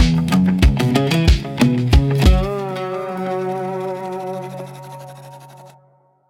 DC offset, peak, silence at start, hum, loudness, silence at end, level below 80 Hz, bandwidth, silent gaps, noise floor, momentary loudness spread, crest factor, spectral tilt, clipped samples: under 0.1%; 0 dBFS; 0 s; none; -18 LUFS; 0.6 s; -22 dBFS; 16 kHz; none; -55 dBFS; 20 LU; 18 dB; -6.5 dB/octave; under 0.1%